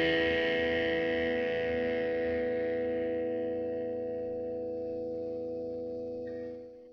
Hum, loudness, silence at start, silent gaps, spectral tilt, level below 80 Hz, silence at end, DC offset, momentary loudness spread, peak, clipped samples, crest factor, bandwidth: none; -33 LUFS; 0 s; none; -6.5 dB/octave; -60 dBFS; 0 s; under 0.1%; 10 LU; -18 dBFS; under 0.1%; 14 dB; 6.4 kHz